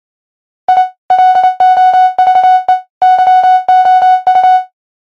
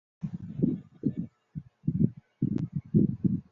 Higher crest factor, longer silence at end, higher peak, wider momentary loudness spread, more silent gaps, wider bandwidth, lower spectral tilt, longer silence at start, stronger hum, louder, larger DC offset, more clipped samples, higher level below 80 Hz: second, 8 dB vs 20 dB; first, 0.4 s vs 0.1 s; first, 0 dBFS vs -10 dBFS; second, 5 LU vs 13 LU; first, 0.98-1.09 s, 2.90-3.01 s vs none; first, 6.2 kHz vs 2.9 kHz; second, -2 dB/octave vs -12.5 dB/octave; first, 0.7 s vs 0.2 s; neither; first, -8 LUFS vs -31 LUFS; first, 0.3% vs under 0.1%; neither; about the same, -58 dBFS vs -54 dBFS